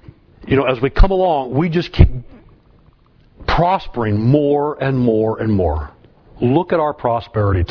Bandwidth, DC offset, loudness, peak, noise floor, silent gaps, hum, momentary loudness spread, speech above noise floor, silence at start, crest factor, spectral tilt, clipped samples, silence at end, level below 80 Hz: 5.4 kHz; under 0.1%; -17 LUFS; 0 dBFS; -50 dBFS; none; none; 6 LU; 35 dB; 0.4 s; 16 dB; -9.5 dB/octave; under 0.1%; 0.05 s; -24 dBFS